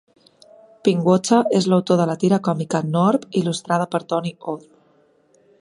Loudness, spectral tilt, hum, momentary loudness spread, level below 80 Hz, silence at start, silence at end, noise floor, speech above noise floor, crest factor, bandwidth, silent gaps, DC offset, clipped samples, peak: -19 LUFS; -6.5 dB/octave; none; 8 LU; -66 dBFS; 0.85 s; 1 s; -58 dBFS; 39 dB; 18 dB; 11.5 kHz; none; under 0.1%; under 0.1%; -2 dBFS